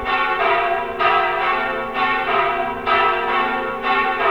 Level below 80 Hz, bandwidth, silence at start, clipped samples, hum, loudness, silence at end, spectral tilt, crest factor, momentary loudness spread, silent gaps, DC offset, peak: -46 dBFS; 19 kHz; 0 s; under 0.1%; none; -18 LUFS; 0 s; -4.5 dB/octave; 16 dB; 5 LU; none; 0.5%; -4 dBFS